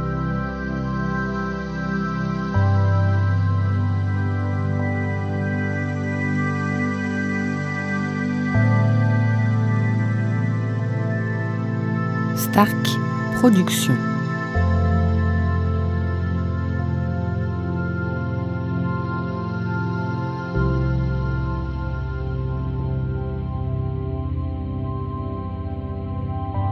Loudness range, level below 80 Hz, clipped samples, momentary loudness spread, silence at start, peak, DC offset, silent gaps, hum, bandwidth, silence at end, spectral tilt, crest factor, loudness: 6 LU; -32 dBFS; under 0.1%; 8 LU; 0 s; -2 dBFS; under 0.1%; none; none; 16 kHz; 0 s; -7 dB/octave; 20 dB; -23 LUFS